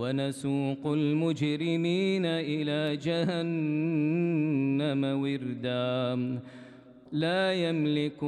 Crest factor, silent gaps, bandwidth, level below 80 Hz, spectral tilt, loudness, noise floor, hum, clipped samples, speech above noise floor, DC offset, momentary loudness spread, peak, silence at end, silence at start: 12 dB; none; 11.5 kHz; -72 dBFS; -7 dB/octave; -29 LUFS; -50 dBFS; none; under 0.1%; 21 dB; under 0.1%; 5 LU; -16 dBFS; 0 s; 0 s